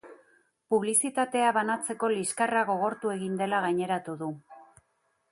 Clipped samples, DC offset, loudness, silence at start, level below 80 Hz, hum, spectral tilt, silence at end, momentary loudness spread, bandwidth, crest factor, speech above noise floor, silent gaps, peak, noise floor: under 0.1%; under 0.1%; -28 LUFS; 0.05 s; -76 dBFS; none; -3.5 dB/octave; 0.7 s; 8 LU; 12 kHz; 18 dB; 46 dB; none; -12 dBFS; -74 dBFS